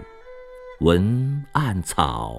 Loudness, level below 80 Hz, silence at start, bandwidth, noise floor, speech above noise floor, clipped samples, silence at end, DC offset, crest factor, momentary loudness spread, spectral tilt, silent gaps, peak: -22 LUFS; -38 dBFS; 0 s; 15.5 kHz; -42 dBFS; 21 dB; under 0.1%; 0 s; under 0.1%; 22 dB; 23 LU; -6 dB/octave; none; -2 dBFS